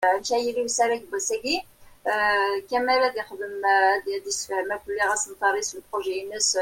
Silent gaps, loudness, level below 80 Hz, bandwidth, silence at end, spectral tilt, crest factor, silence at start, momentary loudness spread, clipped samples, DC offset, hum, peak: none; -24 LUFS; -62 dBFS; 16.5 kHz; 0 s; 0 dB/octave; 18 dB; 0 s; 8 LU; under 0.1%; under 0.1%; none; -8 dBFS